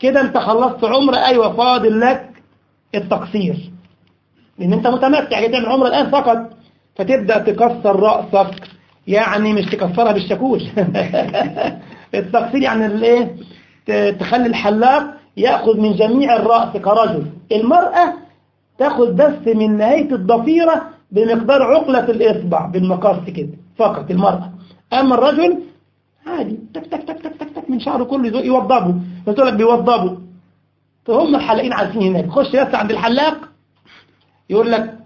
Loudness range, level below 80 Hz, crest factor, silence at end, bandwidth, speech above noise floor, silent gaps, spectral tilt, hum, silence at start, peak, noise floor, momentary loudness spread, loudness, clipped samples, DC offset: 4 LU; -54 dBFS; 16 dB; 0.1 s; 7 kHz; 47 dB; none; -7.5 dB/octave; none; 0 s; 0 dBFS; -61 dBFS; 12 LU; -15 LUFS; under 0.1%; under 0.1%